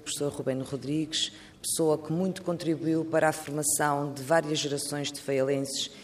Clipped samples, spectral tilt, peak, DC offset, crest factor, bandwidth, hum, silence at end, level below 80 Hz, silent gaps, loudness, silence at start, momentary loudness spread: under 0.1%; -4 dB/octave; -10 dBFS; under 0.1%; 20 dB; 15.5 kHz; none; 0 s; -66 dBFS; none; -29 LUFS; 0 s; 6 LU